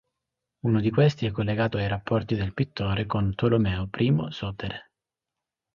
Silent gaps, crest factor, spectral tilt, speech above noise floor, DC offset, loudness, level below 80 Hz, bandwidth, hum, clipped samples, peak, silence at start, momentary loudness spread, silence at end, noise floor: none; 18 dB; -8.5 dB/octave; 63 dB; under 0.1%; -26 LUFS; -46 dBFS; 7.2 kHz; none; under 0.1%; -8 dBFS; 0.65 s; 10 LU; 0.9 s; -88 dBFS